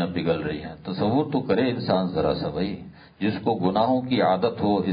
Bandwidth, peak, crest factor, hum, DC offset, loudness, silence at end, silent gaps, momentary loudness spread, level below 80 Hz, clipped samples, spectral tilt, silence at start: 5.2 kHz; -8 dBFS; 16 dB; none; under 0.1%; -24 LUFS; 0 s; none; 8 LU; -50 dBFS; under 0.1%; -11.5 dB/octave; 0 s